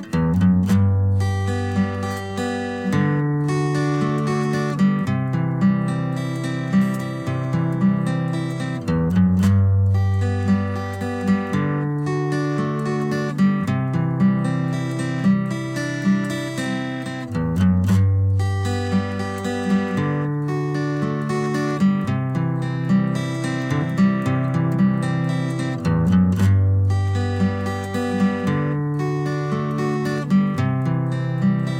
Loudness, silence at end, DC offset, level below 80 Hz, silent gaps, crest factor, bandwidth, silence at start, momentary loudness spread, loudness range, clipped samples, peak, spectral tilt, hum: -21 LUFS; 0 s; under 0.1%; -48 dBFS; none; 12 dB; 12 kHz; 0 s; 7 LU; 2 LU; under 0.1%; -8 dBFS; -7.5 dB/octave; none